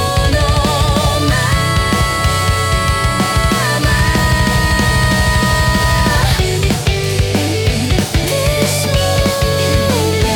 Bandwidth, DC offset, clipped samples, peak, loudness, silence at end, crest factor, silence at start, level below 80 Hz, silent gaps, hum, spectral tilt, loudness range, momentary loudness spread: 18 kHz; under 0.1%; under 0.1%; -2 dBFS; -13 LUFS; 0 s; 10 dB; 0 s; -20 dBFS; none; none; -4.5 dB/octave; 2 LU; 2 LU